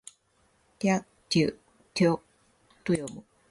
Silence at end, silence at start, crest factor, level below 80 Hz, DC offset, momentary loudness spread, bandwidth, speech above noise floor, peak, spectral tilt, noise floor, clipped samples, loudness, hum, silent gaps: 0.3 s; 0.8 s; 18 dB; -62 dBFS; under 0.1%; 15 LU; 11.5 kHz; 42 dB; -12 dBFS; -5.5 dB/octave; -68 dBFS; under 0.1%; -29 LUFS; none; none